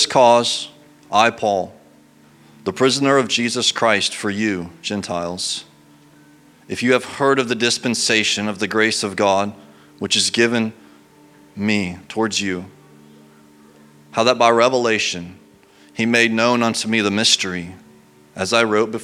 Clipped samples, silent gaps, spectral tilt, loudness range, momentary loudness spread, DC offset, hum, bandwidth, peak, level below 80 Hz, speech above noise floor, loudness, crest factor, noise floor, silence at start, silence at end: under 0.1%; none; -3 dB/octave; 5 LU; 12 LU; under 0.1%; none; 15.5 kHz; 0 dBFS; -62 dBFS; 32 dB; -18 LUFS; 20 dB; -50 dBFS; 0 s; 0 s